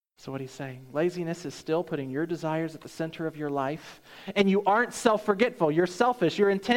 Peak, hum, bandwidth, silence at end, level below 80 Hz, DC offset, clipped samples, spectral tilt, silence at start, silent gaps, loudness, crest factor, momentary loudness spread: -8 dBFS; none; 16.5 kHz; 0 s; -66 dBFS; under 0.1%; under 0.1%; -5.5 dB/octave; 0.25 s; none; -28 LUFS; 20 dB; 14 LU